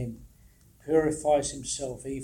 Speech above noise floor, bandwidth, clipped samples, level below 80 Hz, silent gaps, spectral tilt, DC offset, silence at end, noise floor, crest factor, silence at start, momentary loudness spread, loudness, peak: 30 dB; 16.5 kHz; under 0.1%; -52 dBFS; none; -4.5 dB/octave; under 0.1%; 0 s; -57 dBFS; 18 dB; 0 s; 17 LU; -28 LUFS; -12 dBFS